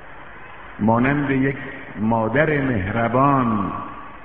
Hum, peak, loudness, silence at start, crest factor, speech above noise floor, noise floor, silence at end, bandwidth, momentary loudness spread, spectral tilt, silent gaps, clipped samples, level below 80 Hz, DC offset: none; -2 dBFS; -20 LUFS; 0 s; 18 dB; 21 dB; -40 dBFS; 0 s; 3.9 kHz; 21 LU; -6.5 dB/octave; none; under 0.1%; -44 dBFS; 0.9%